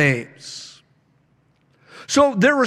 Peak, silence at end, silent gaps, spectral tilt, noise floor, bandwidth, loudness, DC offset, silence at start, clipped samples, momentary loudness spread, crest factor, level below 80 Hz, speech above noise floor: -4 dBFS; 0 s; none; -4.5 dB/octave; -61 dBFS; 13 kHz; -18 LUFS; under 0.1%; 0 s; under 0.1%; 24 LU; 18 dB; -60 dBFS; 43 dB